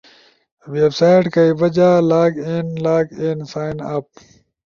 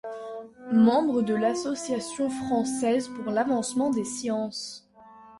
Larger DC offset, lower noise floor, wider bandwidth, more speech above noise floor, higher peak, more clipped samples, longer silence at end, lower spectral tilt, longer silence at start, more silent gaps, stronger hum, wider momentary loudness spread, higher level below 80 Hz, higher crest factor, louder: neither; about the same, -50 dBFS vs -51 dBFS; second, 7.2 kHz vs 11.5 kHz; first, 34 dB vs 25 dB; first, -2 dBFS vs -10 dBFS; neither; first, 0.75 s vs 0 s; first, -7.5 dB/octave vs -4.5 dB/octave; first, 0.65 s vs 0.05 s; neither; neither; second, 12 LU vs 16 LU; first, -56 dBFS vs -66 dBFS; about the same, 14 dB vs 16 dB; first, -16 LUFS vs -26 LUFS